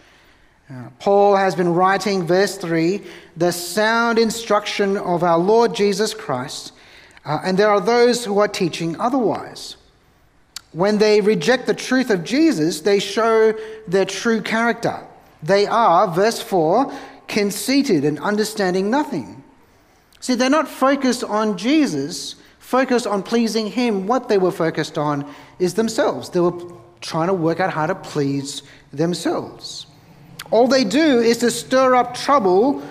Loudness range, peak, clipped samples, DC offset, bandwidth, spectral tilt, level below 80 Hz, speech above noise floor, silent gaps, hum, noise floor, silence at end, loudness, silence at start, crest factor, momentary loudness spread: 4 LU; -2 dBFS; under 0.1%; under 0.1%; 15.5 kHz; -5 dB/octave; -58 dBFS; 37 dB; none; none; -55 dBFS; 0 s; -18 LUFS; 0.7 s; 16 dB; 15 LU